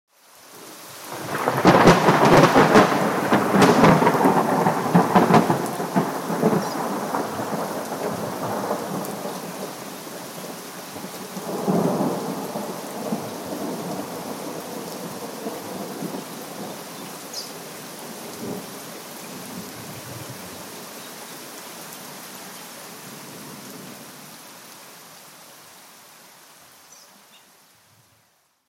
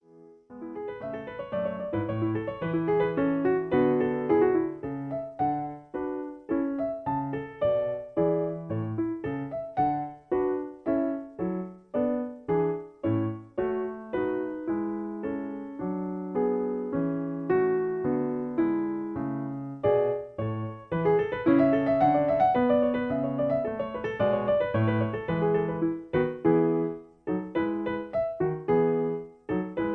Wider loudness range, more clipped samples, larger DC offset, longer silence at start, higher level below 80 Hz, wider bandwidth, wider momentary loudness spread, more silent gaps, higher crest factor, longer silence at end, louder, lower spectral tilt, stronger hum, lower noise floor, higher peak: first, 21 LU vs 6 LU; neither; neither; first, 0.45 s vs 0.15 s; about the same, -54 dBFS vs -58 dBFS; first, 17 kHz vs 4.8 kHz; first, 22 LU vs 10 LU; neither; about the same, 20 dB vs 18 dB; first, 1.7 s vs 0 s; first, -21 LUFS vs -28 LUFS; second, -5.5 dB/octave vs -10.5 dB/octave; neither; first, -63 dBFS vs -54 dBFS; first, -2 dBFS vs -10 dBFS